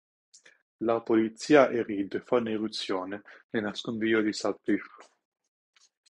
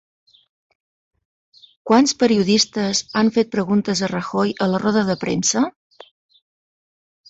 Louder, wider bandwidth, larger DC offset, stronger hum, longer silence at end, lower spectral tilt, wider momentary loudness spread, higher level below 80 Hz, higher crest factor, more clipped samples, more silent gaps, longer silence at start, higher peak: second, -28 LUFS vs -18 LUFS; first, 11 kHz vs 8 kHz; neither; neither; second, 1.25 s vs 1.6 s; about the same, -5 dB/octave vs -4 dB/octave; first, 12 LU vs 6 LU; second, -70 dBFS vs -58 dBFS; about the same, 22 dB vs 18 dB; neither; first, 3.44-3.49 s vs none; second, 0.8 s vs 1.85 s; about the same, -6 dBFS vs -4 dBFS